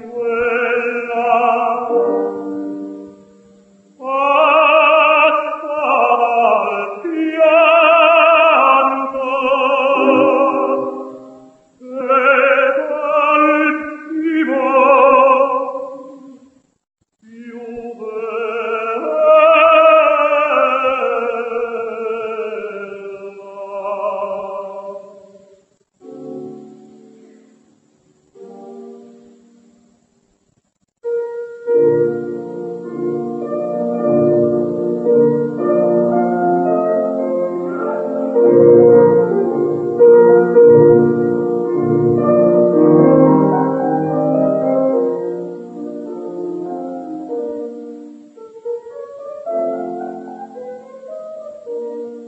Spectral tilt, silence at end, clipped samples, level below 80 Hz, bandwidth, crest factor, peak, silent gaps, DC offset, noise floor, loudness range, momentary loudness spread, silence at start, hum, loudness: -8 dB/octave; 0 s; under 0.1%; -60 dBFS; 7.4 kHz; 16 dB; 0 dBFS; none; under 0.1%; -65 dBFS; 15 LU; 21 LU; 0 s; none; -14 LUFS